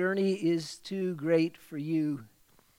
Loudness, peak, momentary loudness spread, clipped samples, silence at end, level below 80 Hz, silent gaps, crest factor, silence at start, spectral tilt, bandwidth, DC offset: -31 LUFS; -14 dBFS; 9 LU; under 0.1%; 0.5 s; -76 dBFS; none; 16 dB; 0 s; -6.5 dB/octave; 16 kHz; under 0.1%